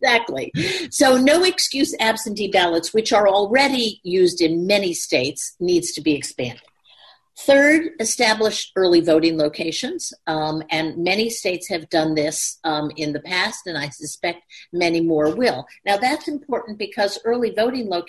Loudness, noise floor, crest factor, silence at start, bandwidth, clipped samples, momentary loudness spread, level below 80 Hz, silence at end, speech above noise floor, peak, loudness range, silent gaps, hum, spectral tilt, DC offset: -19 LUFS; -51 dBFS; 16 dB; 0 s; 13 kHz; under 0.1%; 11 LU; -58 dBFS; 0.05 s; 31 dB; -4 dBFS; 5 LU; none; none; -3 dB/octave; under 0.1%